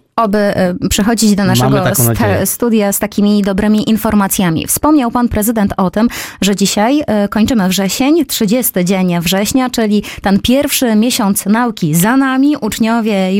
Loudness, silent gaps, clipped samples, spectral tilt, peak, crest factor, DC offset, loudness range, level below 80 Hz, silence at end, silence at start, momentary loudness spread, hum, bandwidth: -12 LUFS; none; under 0.1%; -4.5 dB/octave; 0 dBFS; 12 dB; under 0.1%; 1 LU; -36 dBFS; 0 s; 0.15 s; 3 LU; none; 17 kHz